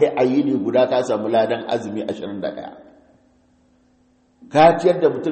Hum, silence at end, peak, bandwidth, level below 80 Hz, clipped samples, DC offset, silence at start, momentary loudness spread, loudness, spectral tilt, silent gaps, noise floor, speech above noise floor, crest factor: none; 0 s; 0 dBFS; 8.8 kHz; -58 dBFS; under 0.1%; under 0.1%; 0 s; 14 LU; -19 LUFS; -6.5 dB/octave; none; -59 dBFS; 40 dB; 20 dB